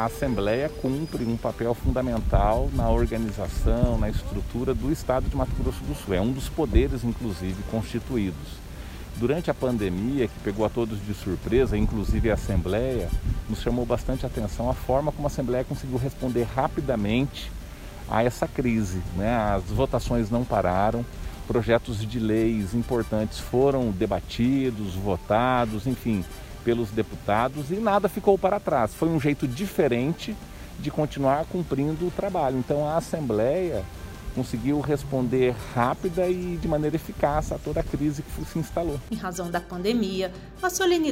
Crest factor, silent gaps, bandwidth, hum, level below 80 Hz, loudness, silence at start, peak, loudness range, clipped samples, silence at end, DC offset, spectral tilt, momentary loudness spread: 20 dB; none; 16 kHz; none; -34 dBFS; -26 LUFS; 0 s; -6 dBFS; 3 LU; under 0.1%; 0 s; under 0.1%; -6.5 dB/octave; 7 LU